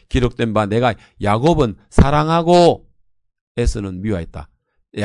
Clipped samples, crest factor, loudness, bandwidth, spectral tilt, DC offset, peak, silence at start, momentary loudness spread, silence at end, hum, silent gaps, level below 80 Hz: under 0.1%; 16 dB; -17 LUFS; 11 kHz; -6.5 dB/octave; under 0.1%; 0 dBFS; 0.1 s; 14 LU; 0 s; none; 3.41-3.55 s; -28 dBFS